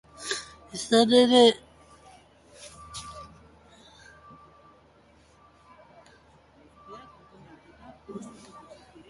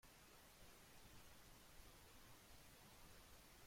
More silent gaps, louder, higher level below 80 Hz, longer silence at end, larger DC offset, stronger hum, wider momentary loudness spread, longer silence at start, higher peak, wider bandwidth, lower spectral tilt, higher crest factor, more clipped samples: neither; first, -21 LUFS vs -65 LUFS; first, -62 dBFS vs -72 dBFS; first, 0.85 s vs 0 s; neither; neither; first, 29 LU vs 1 LU; first, 0.2 s vs 0.05 s; first, -6 dBFS vs -50 dBFS; second, 11.5 kHz vs 16.5 kHz; about the same, -3.5 dB/octave vs -3 dB/octave; first, 24 dB vs 16 dB; neither